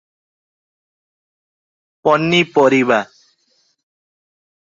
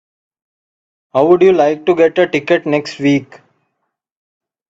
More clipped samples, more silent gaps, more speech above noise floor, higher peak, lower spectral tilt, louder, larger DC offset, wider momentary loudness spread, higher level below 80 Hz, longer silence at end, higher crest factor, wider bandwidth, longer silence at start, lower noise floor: neither; neither; second, 49 dB vs 60 dB; about the same, 0 dBFS vs 0 dBFS; about the same, -5.5 dB/octave vs -6.5 dB/octave; about the same, -14 LUFS vs -13 LUFS; neither; about the same, 8 LU vs 8 LU; about the same, -62 dBFS vs -58 dBFS; first, 1.65 s vs 1.45 s; about the same, 20 dB vs 16 dB; about the same, 7.8 kHz vs 7.8 kHz; first, 2.05 s vs 1.15 s; second, -62 dBFS vs -72 dBFS